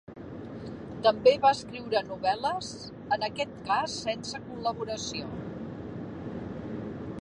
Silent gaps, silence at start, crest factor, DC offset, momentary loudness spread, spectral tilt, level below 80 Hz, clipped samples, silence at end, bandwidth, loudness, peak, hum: none; 0.1 s; 22 dB; under 0.1%; 17 LU; -4.5 dB/octave; -56 dBFS; under 0.1%; 0 s; 11 kHz; -30 LUFS; -8 dBFS; none